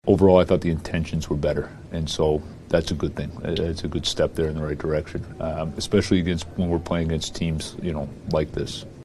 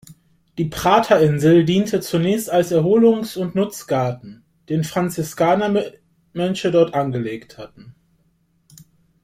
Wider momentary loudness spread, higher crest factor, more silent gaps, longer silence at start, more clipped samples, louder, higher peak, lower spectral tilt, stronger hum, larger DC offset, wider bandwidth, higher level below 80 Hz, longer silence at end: second, 9 LU vs 18 LU; about the same, 20 dB vs 18 dB; neither; about the same, 0.05 s vs 0.1 s; neither; second, -24 LUFS vs -18 LUFS; about the same, -2 dBFS vs -2 dBFS; about the same, -6 dB/octave vs -6.5 dB/octave; neither; neither; second, 12.5 kHz vs 16 kHz; first, -38 dBFS vs -54 dBFS; second, 0 s vs 1.3 s